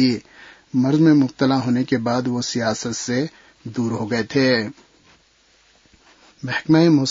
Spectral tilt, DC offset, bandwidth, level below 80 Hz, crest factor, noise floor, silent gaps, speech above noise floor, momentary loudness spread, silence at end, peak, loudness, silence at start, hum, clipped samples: -5.5 dB/octave; under 0.1%; 7.8 kHz; -60 dBFS; 18 dB; -57 dBFS; none; 39 dB; 14 LU; 0 s; -4 dBFS; -19 LUFS; 0 s; none; under 0.1%